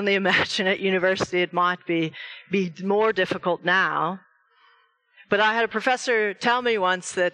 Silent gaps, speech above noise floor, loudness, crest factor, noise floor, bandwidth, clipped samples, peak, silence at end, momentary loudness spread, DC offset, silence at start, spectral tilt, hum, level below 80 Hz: none; 39 dB; -23 LUFS; 18 dB; -61 dBFS; 10.5 kHz; under 0.1%; -6 dBFS; 0.05 s; 6 LU; under 0.1%; 0 s; -4 dB/octave; none; -66 dBFS